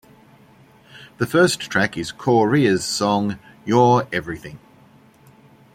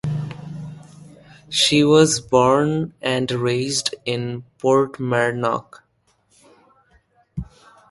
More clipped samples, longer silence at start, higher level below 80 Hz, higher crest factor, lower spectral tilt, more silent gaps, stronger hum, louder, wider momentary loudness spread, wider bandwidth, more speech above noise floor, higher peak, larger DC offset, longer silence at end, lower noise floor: neither; first, 0.95 s vs 0.05 s; about the same, -56 dBFS vs -52 dBFS; about the same, 18 dB vs 20 dB; about the same, -5 dB/octave vs -4.5 dB/octave; neither; neither; about the same, -19 LUFS vs -19 LUFS; second, 14 LU vs 20 LU; first, 16.5 kHz vs 11.5 kHz; second, 32 dB vs 45 dB; about the same, -2 dBFS vs -2 dBFS; neither; first, 1.15 s vs 0.45 s; second, -51 dBFS vs -64 dBFS